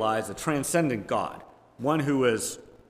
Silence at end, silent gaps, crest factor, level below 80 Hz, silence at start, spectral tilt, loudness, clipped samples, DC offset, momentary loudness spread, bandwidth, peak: 0.25 s; none; 16 dB; -60 dBFS; 0 s; -5 dB/octave; -27 LUFS; under 0.1%; under 0.1%; 9 LU; 16 kHz; -10 dBFS